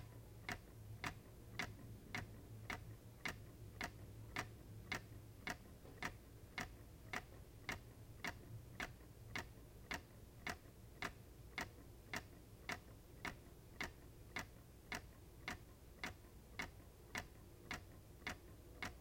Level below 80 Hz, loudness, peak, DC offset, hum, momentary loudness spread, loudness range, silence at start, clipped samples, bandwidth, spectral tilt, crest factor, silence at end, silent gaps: -64 dBFS; -52 LUFS; -28 dBFS; under 0.1%; none; 11 LU; 2 LU; 0 s; under 0.1%; 16.5 kHz; -3.5 dB/octave; 26 dB; 0 s; none